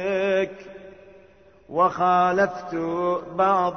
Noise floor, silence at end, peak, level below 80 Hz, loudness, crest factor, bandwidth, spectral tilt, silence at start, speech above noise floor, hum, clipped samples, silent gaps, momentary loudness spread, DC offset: -53 dBFS; 0 s; -8 dBFS; -60 dBFS; -23 LUFS; 16 dB; 6.6 kHz; -6.5 dB/octave; 0 s; 31 dB; none; under 0.1%; none; 15 LU; under 0.1%